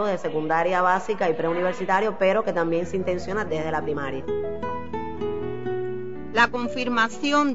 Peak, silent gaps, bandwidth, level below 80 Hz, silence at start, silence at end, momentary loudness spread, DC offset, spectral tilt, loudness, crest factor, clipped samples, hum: -8 dBFS; none; 8 kHz; -52 dBFS; 0 s; 0 s; 9 LU; 2%; -5.5 dB/octave; -25 LUFS; 18 dB; under 0.1%; none